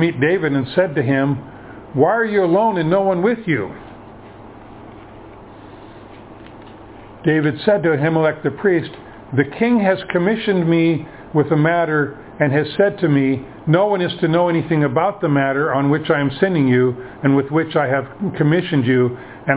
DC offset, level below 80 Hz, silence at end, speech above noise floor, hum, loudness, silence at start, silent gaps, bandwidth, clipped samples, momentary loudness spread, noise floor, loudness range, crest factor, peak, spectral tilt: under 0.1%; -52 dBFS; 0 s; 22 dB; none; -17 LUFS; 0 s; none; 4 kHz; under 0.1%; 6 LU; -38 dBFS; 5 LU; 18 dB; 0 dBFS; -11 dB/octave